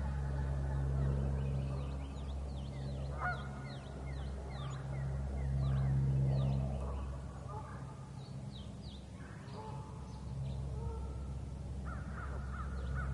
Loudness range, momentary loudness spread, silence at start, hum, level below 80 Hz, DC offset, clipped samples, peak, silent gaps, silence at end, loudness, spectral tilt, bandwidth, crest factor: 9 LU; 13 LU; 0 s; none; -44 dBFS; under 0.1%; under 0.1%; -24 dBFS; none; 0 s; -40 LUFS; -7.5 dB/octave; 11 kHz; 14 dB